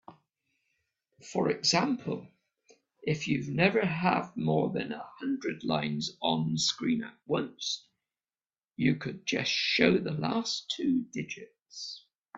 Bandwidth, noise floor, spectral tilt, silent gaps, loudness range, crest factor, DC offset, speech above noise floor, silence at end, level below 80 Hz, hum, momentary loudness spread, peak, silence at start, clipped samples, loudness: 8 kHz; under -90 dBFS; -4.5 dB/octave; none; 3 LU; 24 dB; under 0.1%; over 60 dB; 0 s; -68 dBFS; none; 13 LU; -8 dBFS; 0.1 s; under 0.1%; -30 LUFS